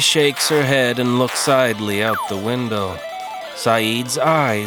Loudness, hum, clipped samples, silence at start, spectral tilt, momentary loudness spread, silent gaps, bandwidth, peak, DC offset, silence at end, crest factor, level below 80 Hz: -18 LUFS; none; under 0.1%; 0 s; -3.5 dB/octave; 10 LU; none; over 20 kHz; 0 dBFS; under 0.1%; 0 s; 18 dB; -60 dBFS